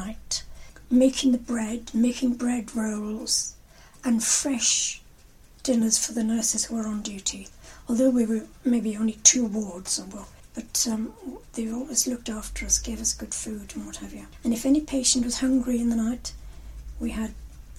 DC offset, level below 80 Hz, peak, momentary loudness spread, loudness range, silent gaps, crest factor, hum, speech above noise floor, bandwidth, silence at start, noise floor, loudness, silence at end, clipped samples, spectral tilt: under 0.1%; -46 dBFS; -2 dBFS; 16 LU; 4 LU; none; 24 dB; none; 26 dB; 16 kHz; 0 s; -51 dBFS; -25 LUFS; 0 s; under 0.1%; -2.5 dB/octave